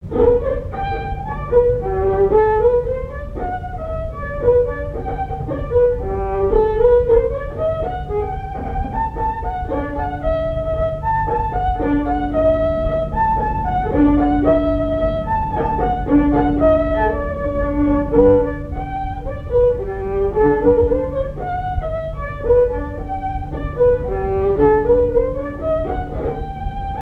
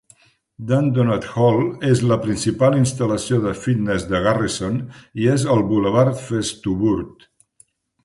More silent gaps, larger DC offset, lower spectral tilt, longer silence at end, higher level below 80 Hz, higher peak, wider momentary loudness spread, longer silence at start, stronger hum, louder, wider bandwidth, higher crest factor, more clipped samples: neither; neither; first, -10 dB/octave vs -6.5 dB/octave; second, 0 s vs 0.95 s; first, -28 dBFS vs -46 dBFS; about the same, 0 dBFS vs -2 dBFS; first, 11 LU vs 7 LU; second, 0 s vs 0.6 s; neither; about the same, -18 LUFS vs -19 LUFS; second, 4.6 kHz vs 11.5 kHz; about the same, 16 dB vs 16 dB; neither